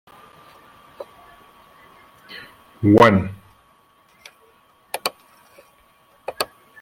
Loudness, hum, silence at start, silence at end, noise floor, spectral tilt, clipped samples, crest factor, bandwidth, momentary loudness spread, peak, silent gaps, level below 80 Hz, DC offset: -19 LUFS; none; 1 s; 0.35 s; -57 dBFS; -6 dB/octave; under 0.1%; 22 dB; 16.5 kHz; 28 LU; -2 dBFS; none; -56 dBFS; under 0.1%